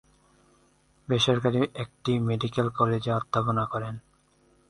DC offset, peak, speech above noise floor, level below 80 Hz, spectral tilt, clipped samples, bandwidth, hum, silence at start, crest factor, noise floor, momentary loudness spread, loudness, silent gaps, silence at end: under 0.1%; -8 dBFS; 37 dB; -58 dBFS; -6 dB/octave; under 0.1%; 11 kHz; none; 1.1 s; 20 dB; -64 dBFS; 10 LU; -27 LUFS; none; 0.7 s